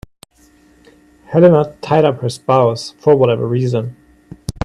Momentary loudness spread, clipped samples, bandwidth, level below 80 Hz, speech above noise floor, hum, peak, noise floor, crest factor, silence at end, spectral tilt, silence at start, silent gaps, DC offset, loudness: 11 LU; under 0.1%; 13 kHz; -46 dBFS; 37 dB; none; 0 dBFS; -50 dBFS; 16 dB; 0.15 s; -7.5 dB/octave; 1.3 s; none; under 0.1%; -14 LUFS